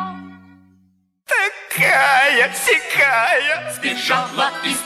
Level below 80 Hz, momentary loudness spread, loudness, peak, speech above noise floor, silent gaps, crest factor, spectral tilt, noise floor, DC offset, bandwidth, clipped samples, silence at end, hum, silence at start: -66 dBFS; 8 LU; -16 LUFS; -4 dBFS; 42 dB; none; 14 dB; -1.5 dB/octave; -59 dBFS; under 0.1%; 15.5 kHz; under 0.1%; 0 s; none; 0 s